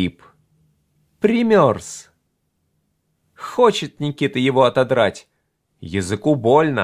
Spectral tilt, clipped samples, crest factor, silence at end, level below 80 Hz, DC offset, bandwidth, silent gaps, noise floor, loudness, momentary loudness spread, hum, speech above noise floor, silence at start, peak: -6 dB/octave; under 0.1%; 18 dB; 0 s; -50 dBFS; under 0.1%; 15 kHz; none; -70 dBFS; -18 LUFS; 13 LU; none; 52 dB; 0 s; 0 dBFS